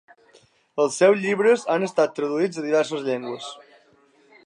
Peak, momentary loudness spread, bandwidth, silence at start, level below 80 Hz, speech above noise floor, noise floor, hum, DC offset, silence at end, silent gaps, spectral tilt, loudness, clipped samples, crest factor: -6 dBFS; 15 LU; 11 kHz; 0.75 s; -78 dBFS; 37 dB; -58 dBFS; none; under 0.1%; 0.9 s; none; -4.5 dB/octave; -22 LUFS; under 0.1%; 18 dB